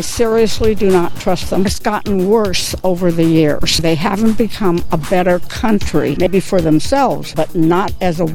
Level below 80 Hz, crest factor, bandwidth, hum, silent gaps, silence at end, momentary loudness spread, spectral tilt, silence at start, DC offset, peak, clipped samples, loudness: -30 dBFS; 12 dB; 17.5 kHz; none; none; 0 s; 4 LU; -5.5 dB/octave; 0 s; under 0.1%; -2 dBFS; under 0.1%; -15 LUFS